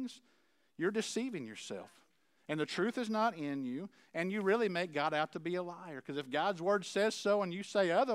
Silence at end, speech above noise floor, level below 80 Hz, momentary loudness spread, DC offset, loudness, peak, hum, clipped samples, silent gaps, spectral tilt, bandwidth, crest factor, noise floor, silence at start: 0 s; 39 dB; under -90 dBFS; 12 LU; under 0.1%; -36 LUFS; -18 dBFS; none; under 0.1%; none; -4.5 dB/octave; 15 kHz; 18 dB; -74 dBFS; 0 s